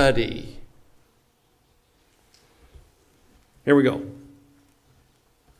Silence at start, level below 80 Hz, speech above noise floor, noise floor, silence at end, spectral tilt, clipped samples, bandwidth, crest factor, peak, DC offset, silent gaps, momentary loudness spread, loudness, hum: 0 s; -46 dBFS; 43 dB; -64 dBFS; 1.45 s; -6 dB/octave; under 0.1%; 14 kHz; 22 dB; -4 dBFS; under 0.1%; none; 24 LU; -22 LUFS; none